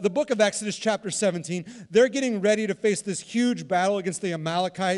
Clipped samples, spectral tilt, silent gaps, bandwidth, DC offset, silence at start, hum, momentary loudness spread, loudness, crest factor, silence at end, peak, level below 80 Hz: under 0.1%; -4 dB/octave; none; 12 kHz; under 0.1%; 0 s; none; 7 LU; -25 LUFS; 16 dB; 0 s; -8 dBFS; -70 dBFS